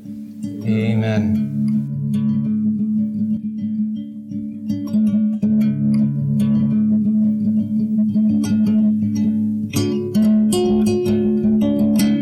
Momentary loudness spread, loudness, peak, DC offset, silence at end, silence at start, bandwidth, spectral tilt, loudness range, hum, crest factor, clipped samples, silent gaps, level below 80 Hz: 8 LU; -18 LUFS; -6 dBFS; under 0.1%; 0 s; 0 s; 13.5 kHz; -7.5 dB/octave; 4 LU; none; 12 dB; under 0.1%; none; -48 dBFS